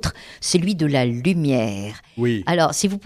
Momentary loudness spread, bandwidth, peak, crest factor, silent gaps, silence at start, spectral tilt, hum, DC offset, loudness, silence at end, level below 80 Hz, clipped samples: 9 LU; 14.5 kHz; -4 dBFS; 16 dB; none; 0.05 s; -5 dB/octave; none; under 0.1%; -20 LUFS; 0.05 s; -44 dBFS; under 0.1%